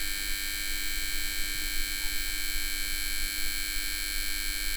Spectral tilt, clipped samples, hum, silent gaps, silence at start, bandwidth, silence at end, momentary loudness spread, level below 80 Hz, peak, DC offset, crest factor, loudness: 0 dB/octave; under 0.1%; none; none; 0 s; over 20 kHz; 0 s; 0 LU; -36 dBFS; -16 dBFS; under 0.1%; 14 dB; -30 LUFS